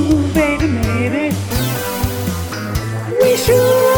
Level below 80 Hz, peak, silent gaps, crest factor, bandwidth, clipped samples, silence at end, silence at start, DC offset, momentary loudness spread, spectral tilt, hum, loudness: -30 dBFS; -2 dBFS; none; 12 dB; over 20 kHz; under 0.1%; 0 s; 0 s; under 0.1%; 9 LU; -5.5 dB/octave; none; -16 LUFS